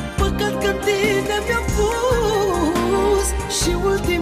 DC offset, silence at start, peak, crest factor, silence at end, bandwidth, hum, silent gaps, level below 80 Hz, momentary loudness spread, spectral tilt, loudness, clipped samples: under 0.1%; 0 s; -6 dBFS; 12 dB; 0 s; 15.5 kHz; none; none; -28 dBFS; 3 LU; -4.5 dB/octave; -19 LUFS; under 0.1%